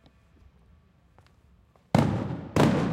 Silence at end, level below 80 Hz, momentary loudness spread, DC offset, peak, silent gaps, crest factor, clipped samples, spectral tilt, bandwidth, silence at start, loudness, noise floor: 0 s; -52 dBFS; 6 LU; under 0.1%; -6 dBFS; none; 22 dB; under 0.1%; -7 dB/octave; 16.5 kHz; 1.95 s; -26 LUFS; -60 dBFS